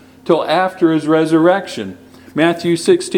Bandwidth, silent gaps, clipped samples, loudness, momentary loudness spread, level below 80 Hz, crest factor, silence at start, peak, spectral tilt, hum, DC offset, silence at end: 15 kHz; none; under 0.1%; -14 LUFS; 13 LU; -60 dBFS; 14 dB; 0.25 s; 0 dBFS; -5.5 dB/octave; none; under 0.1%; 0 s